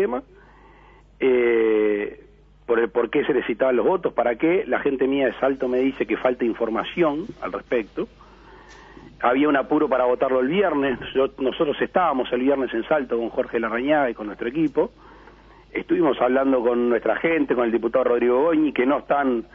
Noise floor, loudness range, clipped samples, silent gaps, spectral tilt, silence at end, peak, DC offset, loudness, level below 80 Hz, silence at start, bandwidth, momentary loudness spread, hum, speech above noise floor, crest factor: -50 dBFS; 4 LU; under 0.1%; none; -8 dB/octave; 0.1 s; -6 dBFS; under 0.1%; -22 LUFS; -52 dBFS; 0 s; 5.8 kHz; 7 LU; none; 29 dB; 16 dB